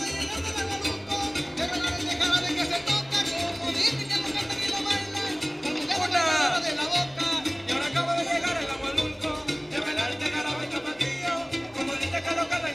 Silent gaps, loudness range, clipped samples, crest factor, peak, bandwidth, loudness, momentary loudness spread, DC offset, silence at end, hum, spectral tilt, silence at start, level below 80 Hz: none; 3 LU; under 0.1%; 18 dB; -10 dBFS; 16 kHz; -26 LUFS; 6 LU; under 0.1%; 0 s; none; -2.5 dB/octave; 0 s; -48 dBFS